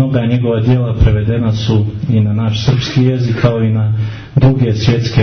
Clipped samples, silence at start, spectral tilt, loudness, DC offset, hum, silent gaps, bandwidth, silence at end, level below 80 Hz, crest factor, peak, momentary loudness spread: under 0.1%; 0 s; -7.5 dB/octave; -13 LUFS; under 0.1%; none; none; 6.4 kHz; 0 s; -26 dBFS; 12 dB; 0 dBFS; 3 LU